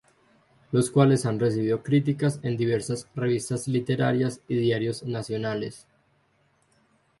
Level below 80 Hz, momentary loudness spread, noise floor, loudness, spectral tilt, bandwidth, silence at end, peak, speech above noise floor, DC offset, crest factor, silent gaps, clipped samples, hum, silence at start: -62 dBFS; 9 LU; -66 dBFS; -25 LUFS; -6.5 dB/octave; 11.5 kHz; 1.4 s; -6 dBFS; 42 dB; under 0.1%; 20 dB; none; under 0.1%; none; 0.7 s